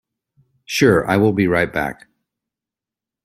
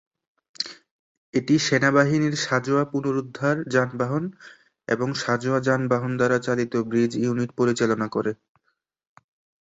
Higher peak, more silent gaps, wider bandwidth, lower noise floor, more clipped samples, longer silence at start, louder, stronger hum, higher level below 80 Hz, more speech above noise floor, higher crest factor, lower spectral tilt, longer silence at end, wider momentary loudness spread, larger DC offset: about the same, -2 dBFS vs -4 dBFS; second, none vs 0.91-1.33 s; first, 16 kHz vs 8 kHz; first, -88 dBFS vs -74 dBFS; neither; about the same, 0.7 s vs 0.6 s; first, -17 LUFS vs -23 LUFS; neither; first, -50 dBFS vs -62 dBFS; first, 71 dB vs 51 dB; about the same, 18 dB vs 20 dB; about the same, -5.5 dB/octave vs -5.5 dB/octave; about the same, 1.3 s vs 1.3 s; about the same, 10 LU vs 10 LU; neither